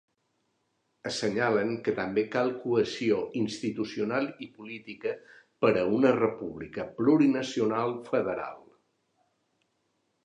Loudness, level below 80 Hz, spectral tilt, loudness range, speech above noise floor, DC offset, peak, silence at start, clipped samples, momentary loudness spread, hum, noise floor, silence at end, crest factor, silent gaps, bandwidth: -28 LUFS; -66 dBFS; -6 dB/octave; 4 LU; 48 dB; under 0.1%; -10 dBFS; 1.05 s; under 0.1%; 14 LU; none; -76 dBFS; 1.65 s; 20 dB; none; 10.5 kHz